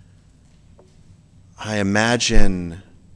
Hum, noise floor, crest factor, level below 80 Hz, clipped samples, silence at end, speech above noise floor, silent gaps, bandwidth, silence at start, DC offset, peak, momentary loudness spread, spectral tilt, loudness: none; -51 dBFS; 18 dB; -24 dBFS; under 0.1%; 0.35 s; 37 dB; none; 9.8 kHz; 1.6 s; under 0.1%; 0 dBFS; 17 LU; -4 dB/octave; -20 LUFS